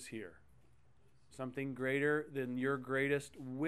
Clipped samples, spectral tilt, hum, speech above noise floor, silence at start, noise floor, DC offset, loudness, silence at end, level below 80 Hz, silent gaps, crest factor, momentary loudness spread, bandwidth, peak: under 0.1%; -6 dB/octave; none; 32 dB; 0 s; -70 dBFS; under 0.1%; -38 LUFS; 0 s; -72 dBFS; none; 18 dB; 13 LU; 13 kHz; -22 dBFS